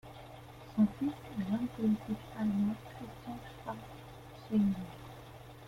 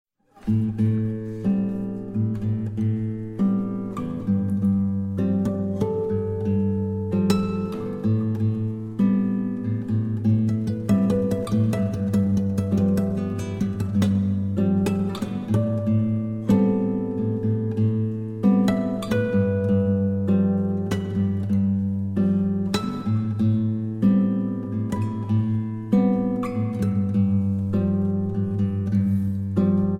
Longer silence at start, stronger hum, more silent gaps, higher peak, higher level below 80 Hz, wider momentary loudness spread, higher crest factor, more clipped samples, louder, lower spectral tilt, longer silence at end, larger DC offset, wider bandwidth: second, 0.05 s vs 0.45 s; neither; neither; second, -20 dBFS vs -6 dBFS; second, -60 dBFS vs -50 dBFS; first, 19 LU vs 6 LU; about the same, 18 dB vs 16 dB; neither; second, -36 LUFS vs -23 LUFS; about the same, -8 dB/octave vs -9 dB/octave; about the same, 0 s vs 0 s; neither; first, 15.5 kHz vs 11 kHz